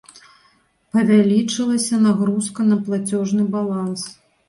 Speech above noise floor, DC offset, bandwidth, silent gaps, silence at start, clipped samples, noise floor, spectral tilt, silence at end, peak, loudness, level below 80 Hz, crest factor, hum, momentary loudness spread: 41 dB; under 0.1%; 11.5 kHz; none; 0.95 s; under 0.1%; -59 dBFS; -5.5 dB/octave; 0.35 s; -4 dBFS; -19 LUFS; -62 dBFS; 16 dB; none; 9 LU